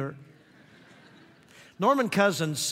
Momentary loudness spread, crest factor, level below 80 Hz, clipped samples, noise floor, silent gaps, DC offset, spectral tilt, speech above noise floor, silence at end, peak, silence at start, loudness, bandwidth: 6 LU; 22 dB; -76 dBFS; under 0.1%; -55 dBFS; none; under 0.1%; -4 dB/octave; 30 dB; 0 s; -8 dBFS; 0 s; -25 LUFS; 16 kHz